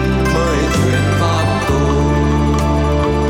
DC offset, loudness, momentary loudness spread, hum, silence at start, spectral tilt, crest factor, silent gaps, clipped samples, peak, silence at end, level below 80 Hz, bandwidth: under 0.1%; -15 LUFS; 1 LU; none; 0 s; -6 dB/octave; 10 dB; none; under 0.1%; -4 dBFS; 0 s; -20 dBFS; 16 kHz